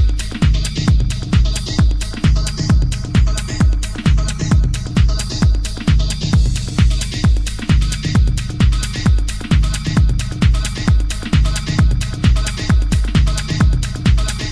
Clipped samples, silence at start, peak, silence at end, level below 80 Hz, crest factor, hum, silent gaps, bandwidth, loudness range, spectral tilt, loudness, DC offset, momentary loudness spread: under 0.1%; 0 s; -2 dBFS; 0 s; -16 dBFS; 12 dB; none; none; 11 kHz; 1 LU; -5.5 dB/octave; -17 LUFS; under 0.1%; 2 LU